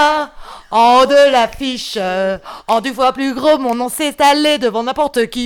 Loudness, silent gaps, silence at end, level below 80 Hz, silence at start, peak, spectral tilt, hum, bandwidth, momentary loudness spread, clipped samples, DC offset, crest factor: -14 LUFS; none; 0 s; -44 dBFS; 0 s; -2 dBFS; -3 dB/octave; none; 18 kHz; 10 LU; under 0.1%; under 0.1%; 12 dB